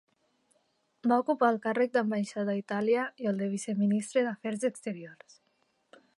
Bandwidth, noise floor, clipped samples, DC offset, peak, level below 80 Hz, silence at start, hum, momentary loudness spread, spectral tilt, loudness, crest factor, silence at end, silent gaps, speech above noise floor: 11.5 kHz; -74 dBFS; under 0.1%; under 0.1%; -12 dBFS; -84 dBFS; 1.05 s; none; 7 LU; -6 dB/octave; -30 LUFS; 20 dB; 1.05 s; none; 44 dB